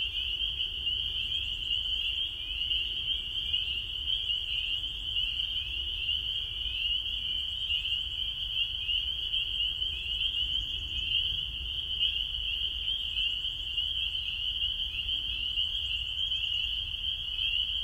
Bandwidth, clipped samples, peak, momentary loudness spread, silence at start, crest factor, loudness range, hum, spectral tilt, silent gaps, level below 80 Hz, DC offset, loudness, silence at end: 16 kHz; under 0.1%; -16 dBFS; 3 LU; 0 s; 16 dB; 1 LU; none; -1.5 dB/octave; none; -46 dBFS; under 0.1%; -29 LUFS; 0 s